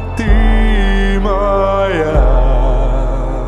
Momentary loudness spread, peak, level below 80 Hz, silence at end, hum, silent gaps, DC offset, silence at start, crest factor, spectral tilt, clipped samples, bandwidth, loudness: 4 LU; 0 dBFS; -12 dBFS; 0 s; none; none; under 0.1%; 0 s; 10 dB; -7.5 dB/octave; under 0.1%; 7 kHz; -14 LUFS